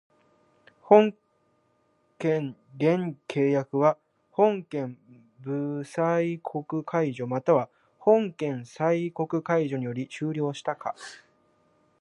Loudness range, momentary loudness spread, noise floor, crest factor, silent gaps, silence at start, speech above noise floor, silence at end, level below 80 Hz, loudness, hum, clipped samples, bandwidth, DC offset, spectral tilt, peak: 3 LU; 12 LU; -69 dBFS; 24 dB; none; 0.85 s; 43 dB; 0.85 s; -78 dBFS; -26 LUFS; none; under 0.1%; 11 kHz; under 0.1%; -7.5 dB/octave; -4 dBFS